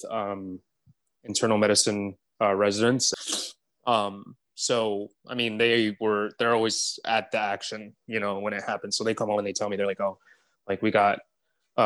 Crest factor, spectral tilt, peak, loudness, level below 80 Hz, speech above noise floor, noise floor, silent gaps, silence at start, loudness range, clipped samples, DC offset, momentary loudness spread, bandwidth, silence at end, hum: 20 dB; -3 dB/octave; -8 dBFS; -26 LUFS; -74 dBFS; 42 dB; -68 dBFS; none; 0 s; 3 LU; under 0.1%; under 0.1%; 12 LU; 12.5 kHz; 0 s; none